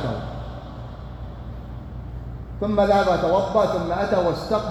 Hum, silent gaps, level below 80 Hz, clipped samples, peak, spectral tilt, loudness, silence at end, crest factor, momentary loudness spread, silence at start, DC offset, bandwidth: none; none; -38 dBFS; under 0.1%; -6 dBFS; -7 dB/octave; -21 LUFS; 0 s; 18 dB; 18 LU; 0 s; under 0.1%; 12.5 kHz